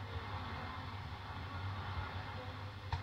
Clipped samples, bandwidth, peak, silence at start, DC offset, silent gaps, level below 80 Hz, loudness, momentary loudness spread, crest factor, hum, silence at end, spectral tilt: under 0.1%; 9 kHz; -24 dBFS; 0 s; under 0.1%; none; -56 dBFS; -45 LUFS; 4 LU; 20 dB; none; 0 s; -6 dB/octave